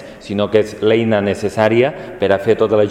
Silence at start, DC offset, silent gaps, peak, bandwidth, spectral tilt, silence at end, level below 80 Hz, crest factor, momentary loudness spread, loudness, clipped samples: 0 s; under 0.1%; none; 0 dBFS; 12 kHz; -6.5 dB/octave; 0 s; -50 dBFS; 16 dB; 6 LU; -16 LUFS; under 0.1%